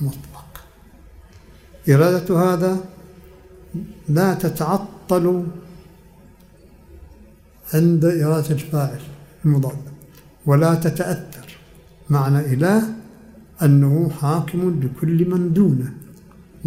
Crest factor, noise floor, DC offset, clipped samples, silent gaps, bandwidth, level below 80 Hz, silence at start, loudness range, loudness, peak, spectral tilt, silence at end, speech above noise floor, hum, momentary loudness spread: 18 dB; -47 dBFS; under 0.1%; under 0.1%; none; 16 kHz; -50 dBFS; 0 s; 4 LU; -19 LUFS; -2 dBFS; -8 dB/octave; 0 s; 30 dB; none; 20 LU